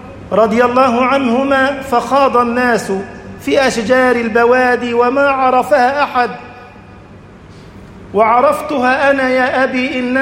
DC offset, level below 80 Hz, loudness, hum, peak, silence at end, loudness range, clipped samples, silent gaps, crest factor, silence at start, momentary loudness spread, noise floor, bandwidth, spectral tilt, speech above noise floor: under 0.1%; -46 dBFS; -12 LUFS; none; 0 dBFS; 0 s; 4 LU; under 0.1%; none; 12 dB; 0 s; 6 LU; -37 dBFS; 16 kHz; -5 dB/octave; 25 dB